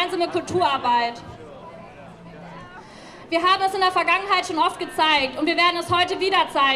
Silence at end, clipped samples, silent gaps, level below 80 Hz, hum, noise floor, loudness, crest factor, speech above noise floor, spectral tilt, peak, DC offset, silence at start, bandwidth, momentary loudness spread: 0 s; under 0.1%; none; -56 dBFS; none; -42 dBFS; -20 LUFS; 16 dB; 21 dB; -3.5 dB/octave; -6 dBFS; under 0.1%; 0 s; 14 kHz; 22 LU